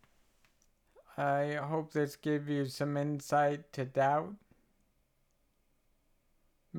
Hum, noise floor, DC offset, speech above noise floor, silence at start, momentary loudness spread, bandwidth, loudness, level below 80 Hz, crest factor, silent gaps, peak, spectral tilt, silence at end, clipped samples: none; -74 dBFS; under 0.1%; 41 dB; 1.1 s; 6 LU; 17.5 kHz; -34 LUFS; -74 dBFS; 18 dB; none; -18 dBFS; -6.5 dB/octave; 0 s; under 0.1%